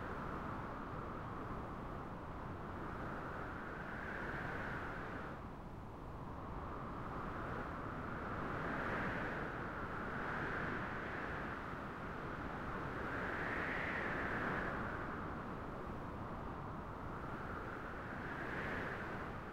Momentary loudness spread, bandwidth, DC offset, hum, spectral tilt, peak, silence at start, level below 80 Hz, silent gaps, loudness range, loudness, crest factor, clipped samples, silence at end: 7 LU; 16 kHz; under 0.1%; none; -7 dB/octave; -28 dBFS; 0 s; -56 dBFS; none; 5 LU; -44 LUFS; 16 dB; under 0.1%; 0 s